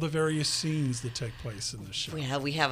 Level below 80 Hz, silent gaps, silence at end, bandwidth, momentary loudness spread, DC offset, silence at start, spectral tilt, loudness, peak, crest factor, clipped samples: -56 dBFS; none; 0 s; 15.5 kHz; 8 LU; under 0.1%; 0 s; -4 dB/octave; -31 LUFS; -10 dBFS; 22 dB; under 0.1%